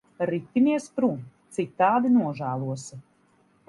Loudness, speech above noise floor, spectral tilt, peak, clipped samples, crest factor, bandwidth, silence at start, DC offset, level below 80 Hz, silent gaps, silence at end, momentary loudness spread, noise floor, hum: -25 LUFS; 39 dB; -7 dB/octave; -8 dBFS; under 0.1%; 18 dB; 11.5 kHz; 0.2 s; under 0.1%; -70 dBFS; none; 0.7 s; 14 LU; -63 dBFS; none